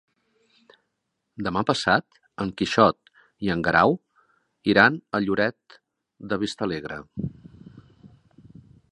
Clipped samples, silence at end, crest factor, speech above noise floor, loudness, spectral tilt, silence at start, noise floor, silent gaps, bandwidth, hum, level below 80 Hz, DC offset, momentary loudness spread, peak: under 0.1%; 0.85 s; 26 dB; 56 dB; -23 LUFS; -5.5 dB/octave; 1.4 s; -79 dBFS; none; 11 kHz; none; -54 dBFS; under 0.1%; 15 LU; 0 dBFS